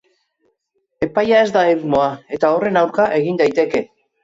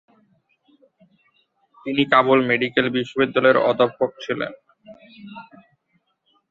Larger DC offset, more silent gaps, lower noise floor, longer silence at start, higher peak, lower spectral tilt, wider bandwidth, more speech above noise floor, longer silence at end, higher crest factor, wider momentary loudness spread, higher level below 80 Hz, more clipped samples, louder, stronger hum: neither; neither; about the same, -69 dBFS vs -68 dBFS; second, 1 s vs 1.85 s; about the same, -4 dBFS vs -2 dBFS; about the same, -6 dB/octave vs -6.5 dB/octave; about the same, 7.8 kHz vs 7.4 kHz; first, 54 dB vs 49 dB; second, 0.4 s vs 1.1 s; second, 14 dB vs 20 dB; second, 7 LU vs 22 LU; first, -54 dBFS vs -64 dBFS; neither; first, -16 LUFS vs -19 LUFS; neither